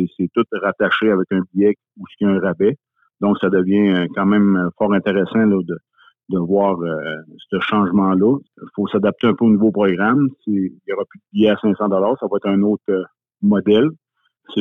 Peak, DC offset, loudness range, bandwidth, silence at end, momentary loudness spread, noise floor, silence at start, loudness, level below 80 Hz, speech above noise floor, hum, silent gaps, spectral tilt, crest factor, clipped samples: -2 dBFS; under 0.1%; 2 LU; 3.9 kHz; 0 s; 10 LU; -47 dBFS; 0 s; -18 LUFS; -60 dBFS; 30 dB; none; none; -9.5 dB/octave; 14 dB; under 0.1%